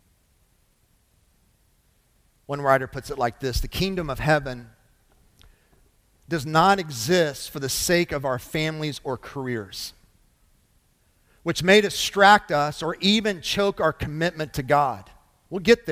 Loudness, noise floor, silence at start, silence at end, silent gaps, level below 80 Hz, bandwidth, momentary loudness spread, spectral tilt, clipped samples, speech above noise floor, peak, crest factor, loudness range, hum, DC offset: -23 LUFS; -64 dBFS; 2.5 s; 0 s; none; -44 dBFS; 16.5 kHz; 14 LU; -4 dB/octave; under 0.1%; 41 dB; -2 dBFS; 22 dB; 9 LU; none; under 0.1%